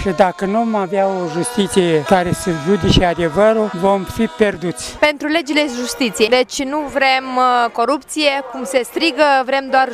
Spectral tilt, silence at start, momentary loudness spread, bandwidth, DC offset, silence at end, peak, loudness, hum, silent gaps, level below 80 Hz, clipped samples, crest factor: -4.5 dB/octave; 0 s; 6 LU; 15.5 kHz; under 0.1%; 0 s; 0 dBFS; -16 LUFS; none; none; -36 dBFS; under 0.1%; 16 dB